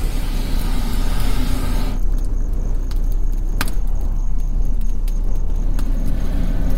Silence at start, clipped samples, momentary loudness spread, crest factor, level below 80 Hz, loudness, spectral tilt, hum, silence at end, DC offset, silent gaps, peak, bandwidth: 0 s; under 0.1%; 2 LU; 12 dB; -18 dBFS; -25 LUFS; -5.5 dB/octave; none; 0 s; 7%; none; -4 dBFS; 15.5 kHz